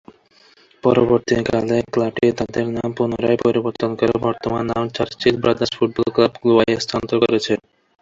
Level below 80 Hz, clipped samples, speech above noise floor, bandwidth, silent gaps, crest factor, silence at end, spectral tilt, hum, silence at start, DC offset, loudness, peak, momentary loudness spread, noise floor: -48 dBFS; under 0.1%; 35 dB; 7.6 kHz; none; 18 dB; 0.45 s; -6 dB/octave; none; 0.85 s; under 0.1%; -19 LUFS; 0 dBFS; 6 LU; -53 dBFS